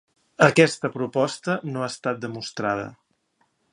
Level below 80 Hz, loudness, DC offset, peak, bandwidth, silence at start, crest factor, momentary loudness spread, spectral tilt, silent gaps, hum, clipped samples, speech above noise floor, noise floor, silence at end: -66 dBFS; -23 LUFS; under 0.1%; 0 dBFS; 11.5 kHz; 0.4 s; 24 dB; 13 LU; -5 dB/octave; none; none; under 0.1%; 46 dB; -69 dBFS; 0.8 s